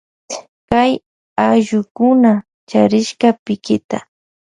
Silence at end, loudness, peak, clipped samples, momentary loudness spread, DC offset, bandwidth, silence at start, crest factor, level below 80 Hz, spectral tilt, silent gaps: 0.5 s; -15 LUFS; 0 dBFS; under 0.1%; 14 LU; under 0.1%; 10.5 kHz; 0.3 s; 16 dB; -52 dBFS; -5.5 dB/octave; 0.48-0.68 s, 1.06-1.36 s, 1.91-1.95 s, 2.54-2.67 s, 3.39-3.46 s, 3.84-3.89 s